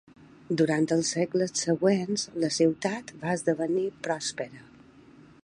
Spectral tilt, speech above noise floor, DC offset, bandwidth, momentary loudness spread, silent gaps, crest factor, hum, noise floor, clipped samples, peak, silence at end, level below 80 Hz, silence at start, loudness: -4.5 dB/octave; 26 dB; under 0.1%; 11 kHz; 8 LU; none; 16 dB; none; -53 dBFS; under 0.1%; -12 dBFS; 0.8 s; -68 dBFS; 0.5 s; -27 LUFS